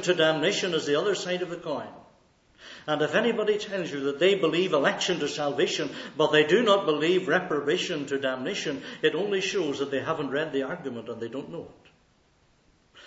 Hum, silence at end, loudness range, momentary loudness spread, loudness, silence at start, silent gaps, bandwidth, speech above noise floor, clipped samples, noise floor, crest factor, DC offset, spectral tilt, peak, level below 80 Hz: none; 0.05 s; 5 LU; 13 LU; -26 LUFS; 0 s; none; 8 kHz; 37 dB; under 0.1%; -64 dBFS; 20 dB; under 0.1%; -4 dB/octave; -8 dBFS; -70 dBFS